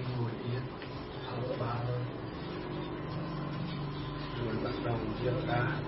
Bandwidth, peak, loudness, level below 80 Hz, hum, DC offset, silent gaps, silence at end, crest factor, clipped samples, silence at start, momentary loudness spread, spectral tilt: 5.8 kHz; -18 dBFS; -36 LUFS; -52 dBFS; none; under 0.1%; none; 0 s; 16 dB; under 0.1%; 0 s; 7 LU; -6 dB/octave